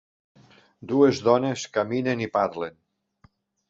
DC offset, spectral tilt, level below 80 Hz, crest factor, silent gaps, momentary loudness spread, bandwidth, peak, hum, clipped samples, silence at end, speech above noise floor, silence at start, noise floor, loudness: under 0.1%; -6 dB/octave; -64 dBFS; 20 dB; none; 14 LU; 8 kHz; -6 dBFS; none; under 0.1%; 1 s; 38 dB; 0.8 s; -61 dBFS; -24 LUFS